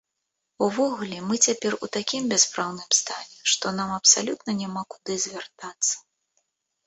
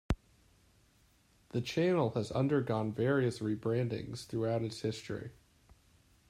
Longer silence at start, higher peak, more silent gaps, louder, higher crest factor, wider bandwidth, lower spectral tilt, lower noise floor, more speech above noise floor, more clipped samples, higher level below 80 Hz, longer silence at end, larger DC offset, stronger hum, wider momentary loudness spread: first, 0.6 s vs 0.1 s; first, -4 dBFS vs -18 dBFS; neither; first, -23 LUFS vs -34 LUFS; about the same, 22 dB vs 18 dB; second, 8.4 kHz vs 13.5 kHz; second, -1.5 dB/octave vs -7 dB/octave; first, -81 dBFS vs -68 dBFS; first, 56 dB vs 35 dB; neither; second, -68 dBFS vs -54 dBFS; second, 0.85 s vs 1 s; neither; neither; first, 13 LU vs 10 LU